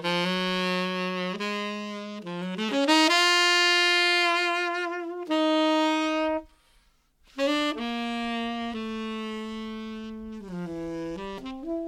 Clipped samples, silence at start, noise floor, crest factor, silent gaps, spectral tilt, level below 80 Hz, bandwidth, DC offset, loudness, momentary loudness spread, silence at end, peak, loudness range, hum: under 0.1%; 0 s; -63 dBFS; 20 dB; none; -3.5 dB/octave; -58 dBFS; 16.5 kHz; under 0.1%; -25 LUFS; 17 LU; 0 s; -6 dBFS; 11 LU; none